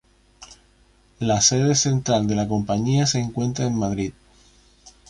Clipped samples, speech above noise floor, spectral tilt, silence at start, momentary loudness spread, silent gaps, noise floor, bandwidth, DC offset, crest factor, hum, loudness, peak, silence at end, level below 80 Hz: under 0.1%; 36 dB; -4.5 dB/octave; 0.4 s; 9 LU; none; -57 dBFS; 11.5 kHz; under 0.1%; 20 dB; 50 Hz at -45 dBFS; -21 LUFS; -4 dBFS; 0.2 s; -48 dBFS